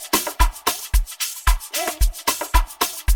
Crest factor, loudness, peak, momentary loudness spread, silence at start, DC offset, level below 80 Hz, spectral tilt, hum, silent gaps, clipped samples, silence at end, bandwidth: 18 dB; -22 LUFS; -2 dBFS; 4 LU; 0 s; under 0.1%; -22 dBFS; -2.5 dB/octave; none; none; under 0.1%; 0 s; 19.5 kHz